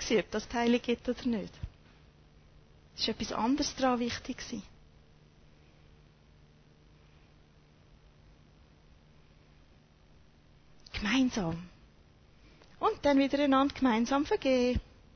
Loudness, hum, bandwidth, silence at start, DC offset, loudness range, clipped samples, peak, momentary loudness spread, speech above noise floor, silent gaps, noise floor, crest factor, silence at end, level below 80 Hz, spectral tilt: -31 LUFS; none; 6.6 kHz; 0 s; under 0.1%; 10 LU; under 0.1%; -16 dBFS; 16 LU; 31 dB; none; -61 dBFS; 18 dB; 0.35 s; -52 dBFS; -4.5 dB/octave